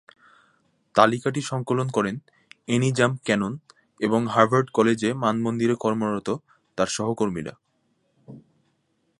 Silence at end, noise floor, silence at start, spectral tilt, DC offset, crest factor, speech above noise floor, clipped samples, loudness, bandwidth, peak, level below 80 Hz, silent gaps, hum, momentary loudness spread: 0.8 s; -70 dBFS; 0.95 s; -5.5 dB/octave; under 0.1%; 24 dB; 48 dB; under 0.1%; -23 LUFS; 11.5 kHz; 0 dBFS; -62 dBFS; none; none; 12 LU